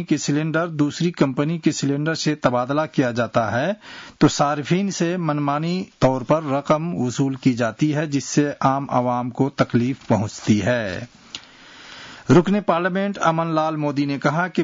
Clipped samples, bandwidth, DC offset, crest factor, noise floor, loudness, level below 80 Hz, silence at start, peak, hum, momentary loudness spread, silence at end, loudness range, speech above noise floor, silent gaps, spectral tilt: under 0.1%; 7.8 kHz; under 0.1%; 16 dB; -44 dBFS; -21 LUFS; -54 dBFS; 0 s; -4 dBFS; none; 5 LU; 0 s; 1 LU; 24 dB; none; -6 dB/octave